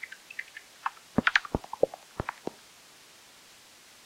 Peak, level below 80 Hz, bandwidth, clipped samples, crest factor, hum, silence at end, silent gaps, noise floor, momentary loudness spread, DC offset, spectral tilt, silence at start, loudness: -6 dBFS; -54 dBFS; 16.5 kHz; under 0.1%; 28 dB; none; 1.55 s; none; -55 dBFS; 26 LU; under 0.1%; -4.5 dB/octave; 0 s; -32 LUFS